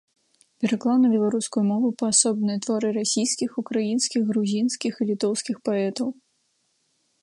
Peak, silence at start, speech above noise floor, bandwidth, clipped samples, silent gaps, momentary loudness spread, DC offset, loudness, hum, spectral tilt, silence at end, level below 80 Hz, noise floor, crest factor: -4 dBFS; 0.6 s; 47 dB; 11.5 kHz; under 0.1%; none; 7 LU; under 0.1%; -23 LUFS; none; -4 dB/octave; 1.1 s; -74 dBFS; -70 dBFS; 20 dB